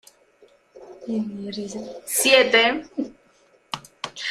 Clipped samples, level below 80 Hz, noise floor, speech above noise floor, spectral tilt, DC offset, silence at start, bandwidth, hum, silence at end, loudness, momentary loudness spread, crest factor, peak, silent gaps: under 0.1%; -64 dBFS; -59 dBFS; 37 dB; -1.5 dB/octave; under 0.1%; 0.75 s; 16 kHz; none; 0 s; -21 LUFS; 20 LU; 22 dB; -2 dBFS; none